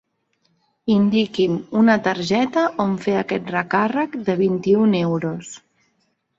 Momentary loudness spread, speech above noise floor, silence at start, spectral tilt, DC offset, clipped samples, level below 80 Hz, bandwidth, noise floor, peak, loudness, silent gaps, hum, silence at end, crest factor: 8 LU; 49 dB; 0.85 s; -6.5 dB/octave; under 0.1%; under 0.1%; -60 dBFS; 7.8 kHz; -68 dBFS; -2 dBFS; -19 LUFS; none; none; 0.8 s; 18 dB